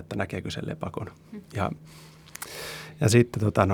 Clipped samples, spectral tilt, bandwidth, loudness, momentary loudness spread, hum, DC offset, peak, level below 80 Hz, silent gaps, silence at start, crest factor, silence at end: under 0.1%; -6 dB/octave; 20 kHz; -28 LUFS; 23 LU; none; under 0.1%; -4 dBFS; -54 dBFS; none; 0 s; 22 dB; 0 s